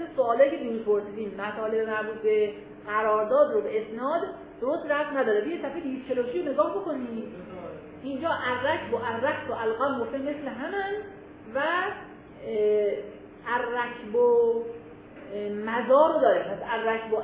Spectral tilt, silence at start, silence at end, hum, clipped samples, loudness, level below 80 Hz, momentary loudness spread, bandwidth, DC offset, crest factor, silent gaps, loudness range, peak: -9 dB/octave; 0 s; 0 s; none; under 0.1%; -27 LUFS; -62 dBFS; 17 LU; 4 kHz; under 0.1%; 18 dB; none; 5 LU; -8 dBFS